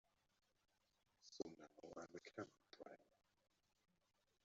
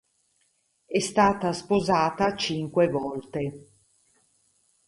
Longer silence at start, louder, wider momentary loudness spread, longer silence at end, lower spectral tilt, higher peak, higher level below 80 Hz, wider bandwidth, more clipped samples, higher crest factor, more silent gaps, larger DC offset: first, 1.2 s vs 0.9 s; second, -58 LUFS vs -25 LUFS; about the same, 9 LU vs 10 LU; about the same, 1.35 s vs 1.25 s; about the same, -4 dB/octave vs -5 dB/octave; second, -34 dBFS vs -8 dBFS; second, under -90 dBFS vs -56 dBFS; second, 7.4 kHz vs 11.5 kHz; neither; first, 28 dB vs 20 dB; neither; neither